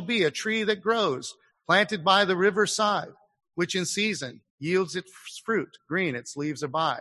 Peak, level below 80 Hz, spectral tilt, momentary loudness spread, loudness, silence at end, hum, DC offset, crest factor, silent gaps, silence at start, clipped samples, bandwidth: -6 dBFS; -72 dBFS; -3.5 dB/octave; 15 LU; -26 LUFS; 0 s; none; under 0.1%; 20 dB; 4.50-4.58 s; 0 s; under 0.1%; 12.5 kHz